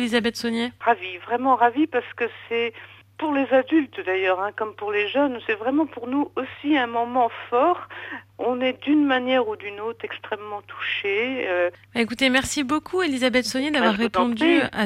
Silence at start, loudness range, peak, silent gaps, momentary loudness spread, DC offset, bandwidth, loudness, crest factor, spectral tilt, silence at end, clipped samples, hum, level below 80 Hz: 0 s; 2 LU; -4 dBFS; none; 11 LU; under 0.1%; 15 kHz; -23 LUFS; 18 dB; -4 dB/octave; 0 s; under 0.1%; none; -58 dBFS